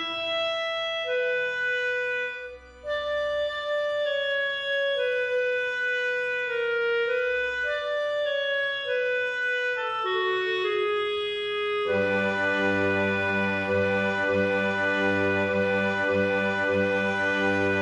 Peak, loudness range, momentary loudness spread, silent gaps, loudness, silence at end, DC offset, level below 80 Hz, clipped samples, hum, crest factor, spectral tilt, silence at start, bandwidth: -12 dBFS; 3 LU; 4 LU; none; -26 LUFS; 0 s; under 0.1%; -62 dBFS; under 0.1%; none; 14 dB; -5 dB/octave; 0 s; 10 kHz